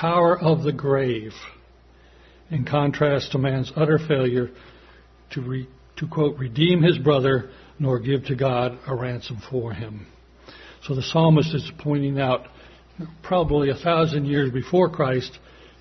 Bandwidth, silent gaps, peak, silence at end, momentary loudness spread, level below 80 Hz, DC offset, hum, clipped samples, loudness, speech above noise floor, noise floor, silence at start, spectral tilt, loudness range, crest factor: 6.4 kHz; none; -4 dBFS; 0.45 s; 16 LU; -48 dBFS; under 0.1%; none; under 0.1%; -22 LUFS; 30 dB; -52 dBFS; 0 s; -7.5 dB/octave; 3 LU; 20 dB